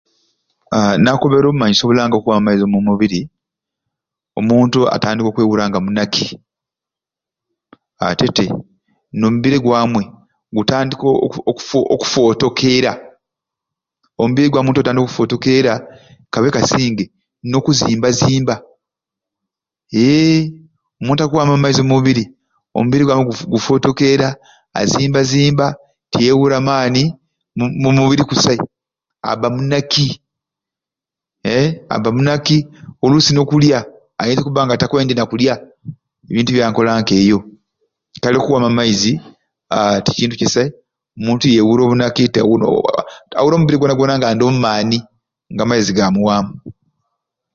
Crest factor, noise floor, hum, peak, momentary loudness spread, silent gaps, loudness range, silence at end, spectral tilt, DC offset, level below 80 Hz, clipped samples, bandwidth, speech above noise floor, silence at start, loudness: 14 dB; -87 dBFS; none; 0 dBFS; 10 LU; none; 3 LU; 0.85 s; -5.5 dB/octave; under 0.1%; -48 dBFS; under 0.1%; 7.6 kHz; 73 dB; 0.7 s; -14 LUFS